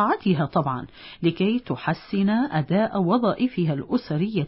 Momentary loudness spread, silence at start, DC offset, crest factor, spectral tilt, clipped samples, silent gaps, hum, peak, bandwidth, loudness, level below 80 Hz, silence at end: 6 LU; 0 s; under 0.1%; 14 dB; -12 dB/octave; under 0.1%; none; none; -8 dBFS; 5.8 kHz; -24 LUFS; -58 dBFS; 0 s